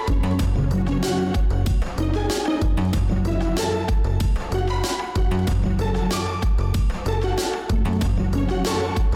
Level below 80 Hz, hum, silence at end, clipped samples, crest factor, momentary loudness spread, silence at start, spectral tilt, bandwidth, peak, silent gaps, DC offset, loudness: -24 dBFS; none; 0 s; under 0.1%; 8 dB; 2 LU; 0 s; -6 dB/octave; 15.5 kHz; -12 dBFS; none; under 0.1%; -22 LUFS